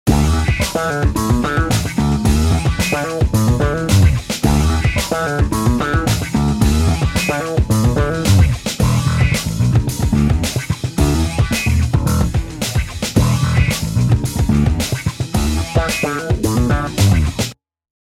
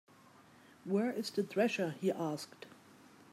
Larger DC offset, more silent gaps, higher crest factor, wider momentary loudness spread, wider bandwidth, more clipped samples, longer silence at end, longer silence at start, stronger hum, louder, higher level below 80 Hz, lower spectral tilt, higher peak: neither; neither; about the same, 16 dB vs 20 dB; second, 4 LU vs 18 LU; about the same, 16.5 kHz vs 15.5 kHz; neither; about the same, 0.55 s vs 0.6 s; second, 0.05 s vs 0.85 s; neither; first, -16 LUFS vs -36 LUFS; first, -22 dBFS vs -88 dBFS; about the same, -5.5 dB/octave vs -5.5 dB/octave; first, 0 dBFS vs -18 dBFS